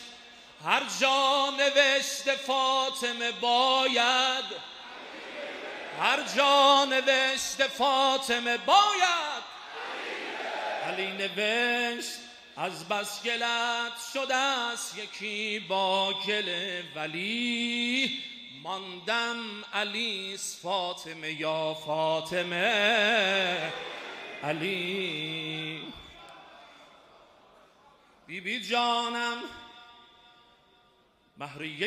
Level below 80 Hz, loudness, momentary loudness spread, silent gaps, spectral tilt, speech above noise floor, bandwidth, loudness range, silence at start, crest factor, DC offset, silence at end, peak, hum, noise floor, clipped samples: -72 dBFS; -27 LUFS; 15 LU; none; -2 dB/octave; 37 dB; 15 kHz; 9 LU; 0 s; 22 dB; under 0.1%; 0 s; -8 dBFS; none; -65 dBFS; under 0.1%